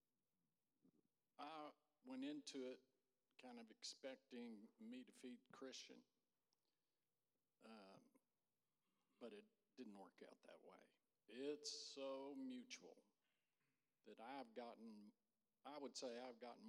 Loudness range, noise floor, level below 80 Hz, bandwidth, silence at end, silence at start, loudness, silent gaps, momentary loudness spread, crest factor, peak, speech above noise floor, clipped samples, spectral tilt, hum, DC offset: 10 LU; under -90 dBFS; under -90 dBFS; 11.5 kHz; 0 s; 0.85 s; -58 LUFS; none; 13 LU; 22 dB; -38 dBFS; over 33 dB; under 0.1%; -2.5 dB/octave; none; under 0.1%